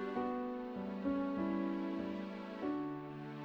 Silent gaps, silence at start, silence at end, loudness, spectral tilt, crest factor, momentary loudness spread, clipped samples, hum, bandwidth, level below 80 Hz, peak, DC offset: none; 0 s; 0 s; -40 LUFS; -8.5 dB/octave; 14 dB; 7 LU; under 0.1%; none; 6.6 kHz; -68 dBFS; -26 dBFS; under 0.1%